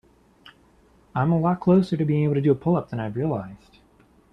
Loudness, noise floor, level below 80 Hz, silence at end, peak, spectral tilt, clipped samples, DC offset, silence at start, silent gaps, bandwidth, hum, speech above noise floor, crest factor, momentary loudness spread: -23 LUFS; -57 dBFS; -56 dBFS; 0.75 s; -8 dBFS; -10 dB/octave; under 0.1%; under 0.1%; 0.45 s; none; 6 kHz; none; 35 dB; 16 dB; 11 LU